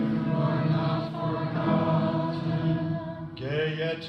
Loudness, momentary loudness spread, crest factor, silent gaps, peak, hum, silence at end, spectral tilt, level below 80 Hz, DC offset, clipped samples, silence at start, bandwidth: -28 LUFS; 7 LU; 14 dB; none; -14 dBFS; none; 0 s; -9 dB/octave; -56 dBFS; under 0.1%; under 0.1%; 0 s; 5.8 kHz